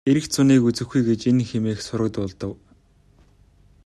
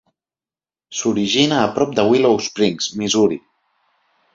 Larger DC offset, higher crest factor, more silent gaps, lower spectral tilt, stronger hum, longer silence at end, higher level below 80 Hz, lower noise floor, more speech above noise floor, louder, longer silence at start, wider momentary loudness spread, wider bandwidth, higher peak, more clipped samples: neither; about the same, 16 dB vs 18 dB; neither; first, -6 dB/octave vs -4 dB/octave; neither; first, 1.3 s vs 0.95 s; about the same, -54 dBFS vs -56 dBFS; second, -56 dBFS vs under -90 dBFS; second, 35 dB vs over 73 dB; second, -21 LUFS vs -17 LUFS; second, 0.05 s vs 0.9 s; first, 13 LU vs 8 LU; first, 13 kHz vs 7.8 kHz; second, -6 dBFS vs 0 dBFS; neither